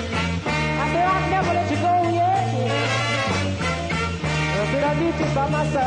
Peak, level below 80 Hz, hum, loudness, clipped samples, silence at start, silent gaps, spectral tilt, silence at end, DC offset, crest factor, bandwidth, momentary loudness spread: -8 dBFS; -40 dBFS; none; -21 LUFS; under 0.1%; 0 s; none; -5.5 dB/octave; 0 s; under 0.1%; 12 dB; 10.5 kHz; 4 LU